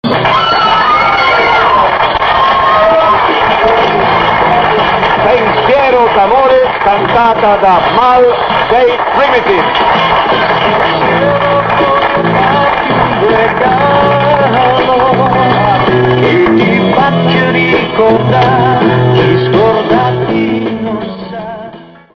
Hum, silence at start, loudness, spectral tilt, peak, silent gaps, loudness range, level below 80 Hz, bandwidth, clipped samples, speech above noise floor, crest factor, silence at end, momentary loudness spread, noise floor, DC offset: none; 0.05 s; -8 LUFS; -7 dB/octave; 0 dBFS; none; 2 LU; -34 dBFS; 6.6 kHz; under 0.1%; 23 dB; 8 dB; 0.3 s; 3 LU; -31 dBFS; under 0.1%